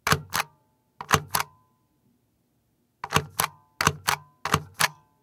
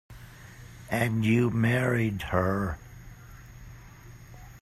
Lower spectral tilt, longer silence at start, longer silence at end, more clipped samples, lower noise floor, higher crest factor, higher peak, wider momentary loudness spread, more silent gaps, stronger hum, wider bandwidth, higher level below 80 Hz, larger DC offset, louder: second, -2.5 dB/octave vs -7 dB/octave; about the same, 0.05 s vs 0.1 s; first, 0.3 s vs 0.05 s; neither; first, -70 dBFS vs -48 dBFS; first, 28 dB vs 20 dB; first, -2 dBFS vs -10 dBFS; second, 10 LU vs 24 LU; neither; neither; first, 18 kHz vs 14.5 kHz; about the same, -52 dBFS vs -50 dBFS; neither; about the same, -26 LUFS vs -27 LUFS